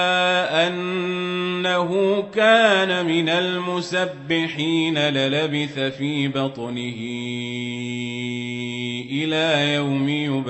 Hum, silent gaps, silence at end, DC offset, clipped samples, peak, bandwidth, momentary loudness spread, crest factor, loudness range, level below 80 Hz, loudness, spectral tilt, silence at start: none; none; 0 s; under 0.1%; under 0.1%; -4 dBFS; 8.4 kHz; 10 LU; 18 dB; 7 LU; -66 dBFS; -21 LUFS; -5 dB/octave; 0 s